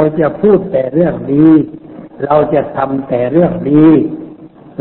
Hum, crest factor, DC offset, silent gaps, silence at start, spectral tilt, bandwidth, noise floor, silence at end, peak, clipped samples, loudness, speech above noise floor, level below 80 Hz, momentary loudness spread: none; 12 dB; under 0.1%; none; 0 s; -12.5 dB/octave; 4.1 kHz; -35 dBFS; 0.35 s; 0 dBFS; under 0.1%; -11 LUFS; 24 dB; -44 dBFS; 15 LU